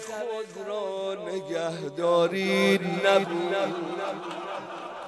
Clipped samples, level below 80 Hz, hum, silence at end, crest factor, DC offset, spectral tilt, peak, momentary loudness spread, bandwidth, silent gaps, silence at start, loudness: under 0.1%; -80 dBFS; none; 0 s; 20 dB; under 0.1%; -5 dB/octave; -8 dBFS; 12 LU; 12 kHz; none; 0 s; -27 LUFS